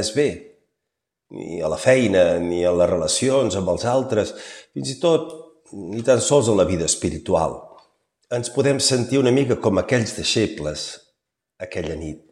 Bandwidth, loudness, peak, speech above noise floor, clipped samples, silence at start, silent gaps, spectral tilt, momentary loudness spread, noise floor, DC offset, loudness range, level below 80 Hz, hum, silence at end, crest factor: 13 kHz; -20 LUFS; -2 dBFS; 62 dB; under 0.1%; 0 s; none; -4.5 dB/octave; 16 LU; -82 dBFS; under 0.1%; 2 LU; -48 dBFS; none; 0.15 s; 18 dB